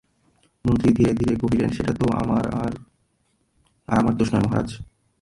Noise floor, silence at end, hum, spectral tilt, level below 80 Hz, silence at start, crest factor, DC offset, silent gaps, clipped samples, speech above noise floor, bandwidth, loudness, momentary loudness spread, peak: -68 dBFS; 0.4 s; none; -8 dB/octave; -42 dBFS; 0.65 s; 18 dB; under 0.1%; none; under 0.1%; 47 dB; 11.5 kHz; -22 LUFS; 10 LU; -6 dBFS